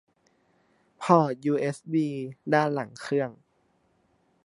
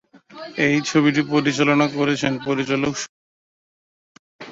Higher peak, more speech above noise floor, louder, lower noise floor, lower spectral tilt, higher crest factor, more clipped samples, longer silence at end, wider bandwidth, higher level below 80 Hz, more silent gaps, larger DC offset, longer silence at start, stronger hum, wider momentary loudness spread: about the same, -4 dBFS vs -4 dBFS; second, 43 dB vs over 71 dB; second, -27 LUFS vs -20 LUFS; second, -69 dBFS vs under -90 dBFS; first, -7 dB/octave vs -5 dB/octave; first, 24 dB vs 18 dB; neither; first, 1.15 s vs 0 s; first, 11.5 kHz vs 7.8 kHz; second, -76 dBFS vs -60 dBFS; second, none vs 3.09-4.39 s; neither; first, 1 s vs 0.3 s; neither; about the same, 12 LU vs 13 LU